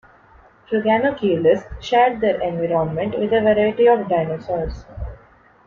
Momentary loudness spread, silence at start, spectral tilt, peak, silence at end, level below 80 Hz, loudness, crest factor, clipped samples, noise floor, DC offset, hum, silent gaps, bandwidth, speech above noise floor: 12 LU; 0.7 s; -7 dB/octave; -2 dBFS; 0.5 s; -40 dBFS; -19 LUFS; 16 dB; under 0.1%; -50 dBFS; under 0.1%; none; none; 7 kHz; 32 dB